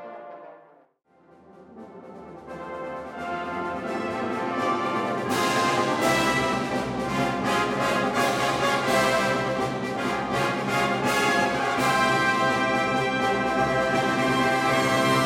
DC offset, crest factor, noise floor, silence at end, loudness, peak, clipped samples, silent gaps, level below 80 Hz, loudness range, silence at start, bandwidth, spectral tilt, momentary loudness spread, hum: under 0.1%; 16 dB; -60 dBFS; 0 s; -24 LUFS; -8 dBFS; under 0.1%; none; -54 dBFS; 11 LU; 0 s; 16.5 kHz; -4 dB/octave; 13 LU; none